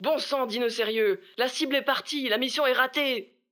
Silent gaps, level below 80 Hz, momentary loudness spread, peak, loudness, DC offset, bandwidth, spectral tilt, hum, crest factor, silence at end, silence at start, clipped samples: none; -88 dBFS; 5 LU; -8 dBFS; -26 LUFS; under 0.1%; over 20 kHz; -2.5 dB/octave; none; 18 dB; 0.25 s; 0 s; under 0.1%